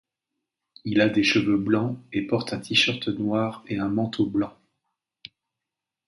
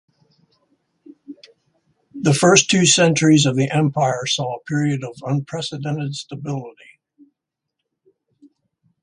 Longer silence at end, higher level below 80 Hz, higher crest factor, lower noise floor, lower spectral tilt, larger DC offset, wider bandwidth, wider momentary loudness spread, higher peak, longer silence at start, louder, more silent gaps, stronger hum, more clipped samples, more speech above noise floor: second, 1.6 s vs 2.3 s; about the same, -60 dBFS vs -60 dBFS; about the same, 18 dB vs 20 dB; first, -87 dBFS vs -80 dBFS; about the same, -5 dB/octave vs -4 dB/octave; neither; about the same, 11.5 kHz vs 11.5 kHz; second, 8 LU vs 15 LU; second, -8 dBFS vs 0 dBFS; second, 0.85 s vs 1.3 s; second, -24 LUFS vs -18 LUFS; neither; neither; neither; about the same, 63 dB vs 62 dB